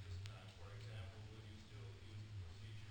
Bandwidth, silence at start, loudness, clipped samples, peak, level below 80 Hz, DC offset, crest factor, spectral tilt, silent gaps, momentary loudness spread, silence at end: 17 kHz; 0 s; -55 LUFS; under 0.1%; -32 dBFS; -66 dBFS; under 0.1%; 22 dB; -5.5 dB/octave; none; 4 LU; 0 s